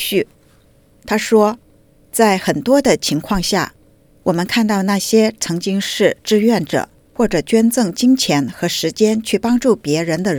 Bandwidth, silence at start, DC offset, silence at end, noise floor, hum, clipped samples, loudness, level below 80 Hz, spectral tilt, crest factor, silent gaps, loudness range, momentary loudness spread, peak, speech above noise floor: over 20 kHz; 0 s; under 0.1%; 0 s; -51 dBFS; none; under 0.1%; -16 LUFS; -44 dBFS; -4.5 dB/octave; 16 dB; none; 1 LU; 7 LU; 0 dBFS; 36 dB